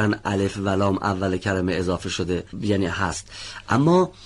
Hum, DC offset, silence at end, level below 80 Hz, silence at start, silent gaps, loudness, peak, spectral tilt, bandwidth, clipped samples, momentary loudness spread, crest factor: none; under 0.1%; 0 s; -46 dBFS; 0 s; none; -23 LUFS; -8 dBFS; -6 dB/octave; 11.5 kHz; under 0.1%; 8 LU; 16 dB